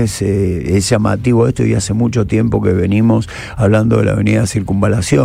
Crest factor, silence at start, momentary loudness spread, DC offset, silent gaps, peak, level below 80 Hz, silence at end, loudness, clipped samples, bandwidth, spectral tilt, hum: 12 dB; 0 s; 3 LU; under 0.1%; none; 0 dBFS; -32 dBFS; 0 s; -14 LUFS; under 0.1%; 14 kHz; -6.5 dB/octave; none